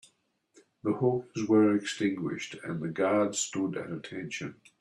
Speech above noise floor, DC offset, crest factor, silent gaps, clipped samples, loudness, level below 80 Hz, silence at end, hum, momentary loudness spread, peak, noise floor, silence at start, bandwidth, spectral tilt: 41 dB; under 0.1%; 18 dB; none; under 0.1%; -30 LUFS; -72 dBFS; 0.3 s; none; 13 LU; -12 dBFS; -70 dBFS; 0.85 s; 12 kHz; -5 dB/octave